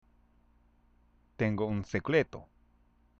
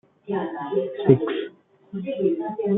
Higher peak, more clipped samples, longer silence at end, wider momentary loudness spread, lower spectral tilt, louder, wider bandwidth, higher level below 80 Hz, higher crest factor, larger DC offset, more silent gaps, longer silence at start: second, -14 dBFS vs -2 dBFS; neither; first, 0.75 s vs 0 s; second, 9 LU vs 14 LU; second, -7.5 dB/octave vs -11.5 dB/octave; second, -32 LUFS vs -24 LUFS; first, 7.4 kHz vs 3.9 kHz; about the same, -60 dBFS vs -62 dBFS; about the same, 22 dB vs 22 dB; neither; neither; first, 1.4 s vs 0.25 s